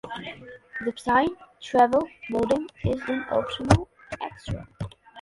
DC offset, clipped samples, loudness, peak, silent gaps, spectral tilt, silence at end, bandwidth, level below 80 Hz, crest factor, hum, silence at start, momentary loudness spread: under 0.1%; under 0.1%; -26 LUFS; -2 dBFS; none; -6 dB/octave; 0 s; 11.5 kHz; -42 dBFS; 24 dB; none; 0.05 s; 17 LU